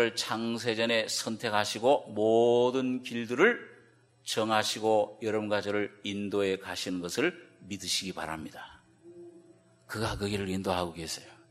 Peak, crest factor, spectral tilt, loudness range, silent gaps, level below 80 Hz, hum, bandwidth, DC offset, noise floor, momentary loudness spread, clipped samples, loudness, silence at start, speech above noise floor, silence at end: -10 dBFS; 22 dB; -4 dB/octave; 8 LU; none; -60 dBFS; none; 15.5 kHz; under 0.1%; -61 dBFS; 13 LU; under 0.1%; -30 LUFS; 0 s; 31 dB; 0.15 s